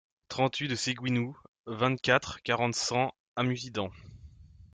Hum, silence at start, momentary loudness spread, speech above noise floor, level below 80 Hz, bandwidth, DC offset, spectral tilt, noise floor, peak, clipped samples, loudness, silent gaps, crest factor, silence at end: none; 0.3 s; 12 LU; 22 dB; -62 dBFS; 9.6 kHz; under 0.1%; -4.5 dB/octave; -52 dBFS; -8 dBFS; under 0.1%; -30 LUFS; 1.48-1.64 s, 3.20-3.36 s; 22 dB; 0.1 s